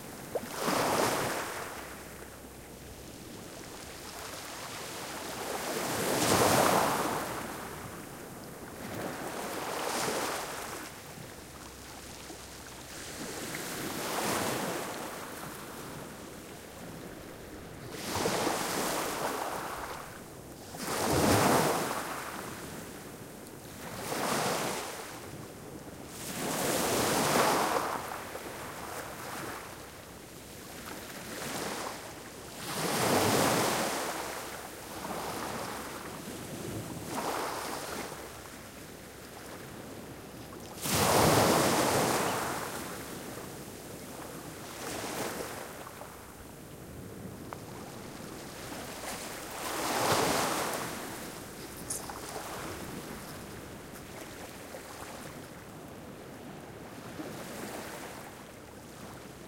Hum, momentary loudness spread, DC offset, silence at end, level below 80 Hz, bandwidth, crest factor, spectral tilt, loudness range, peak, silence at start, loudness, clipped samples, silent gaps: none; 19 LU; under 0.1%; 0 s; -58 dBFS; 16.5 kHz; 22 dB; -3.5 dB/octave; 13 LU; -12 dBFS; 0 s; -33 LUFS; under 0.1%; none